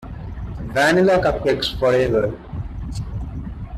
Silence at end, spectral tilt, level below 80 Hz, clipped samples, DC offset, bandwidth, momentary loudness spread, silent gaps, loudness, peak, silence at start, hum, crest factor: 0 s; -5.5 dB/octave; -34 dBFS; under 0.1%; under 0.1%; 14 kHz; 16 LU; none; -19 LUFS; -4 dBFS; 0 s; none; 16 dB